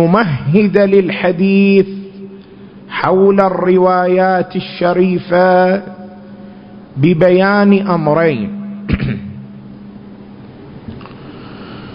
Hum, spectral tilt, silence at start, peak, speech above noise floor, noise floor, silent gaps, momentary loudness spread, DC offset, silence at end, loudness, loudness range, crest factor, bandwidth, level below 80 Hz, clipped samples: none; -10 dB/octave; 0 s; 0 dBFS; 25 dB; -36 dBFS; none; 23 LU; under 0.1%; 0 s; -12 LUFS; 7 LU; 14 dB; 5.4 kHz; -40 dBFS; under 0.1%